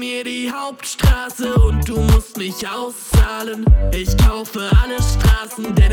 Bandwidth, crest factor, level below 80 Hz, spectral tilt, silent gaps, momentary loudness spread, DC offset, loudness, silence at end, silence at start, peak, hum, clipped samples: 17.5 kHz; 14 dB; -18 dBFS; -5.5 dB/octave; none; 9 LU; under 0.1%; -18 LUFS; 0 s; 0 s; 0 dBFS; none; under 0.1%